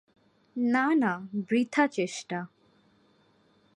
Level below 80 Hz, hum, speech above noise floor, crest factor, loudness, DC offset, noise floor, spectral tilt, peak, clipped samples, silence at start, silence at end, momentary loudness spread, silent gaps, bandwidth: -80 dBFS; none; 38 dB; 20 dB; -28 LUFS; under 0.1%; -65 dBFS; -5 dB/octave; -10 dBFS; under 0.1%; 0.55 s; 1.3 s; 13 LU; none; 11 kHz